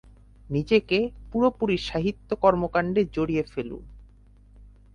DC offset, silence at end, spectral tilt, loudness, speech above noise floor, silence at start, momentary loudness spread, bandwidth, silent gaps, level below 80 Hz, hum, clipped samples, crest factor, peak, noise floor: under 0.1%; 0.25 s; -7 dB/octave; -25 LUFS; 28 dB; 0.5 s; 10 LU; 9.8 kHz; none; -46 dBFS; none; under 0.1%; 20 dB; -6 dBFS; -53 dBFS